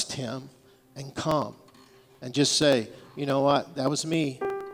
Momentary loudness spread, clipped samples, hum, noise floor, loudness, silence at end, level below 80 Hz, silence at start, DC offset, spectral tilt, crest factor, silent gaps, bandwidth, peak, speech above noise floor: 17 LU; under 0.1%; none; -55 dBFS; -26 LUFS; 0 s; -64 dBFS; 0 s; under 0.1%; -4 dB/octave; 20 dB; none; 17.5 kHz; -8 dBFS; 29 dB